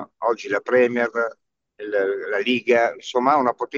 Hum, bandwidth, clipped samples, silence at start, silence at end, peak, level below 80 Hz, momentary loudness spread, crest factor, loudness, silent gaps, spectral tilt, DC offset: none; 7.4 kHz; under 0.1%; 0 s; 0 s; -4 dBFS; -76 dBFS; 8 LU; 18 dB; -21 LUFS; none; -4.5 dB/octave; under 0.1%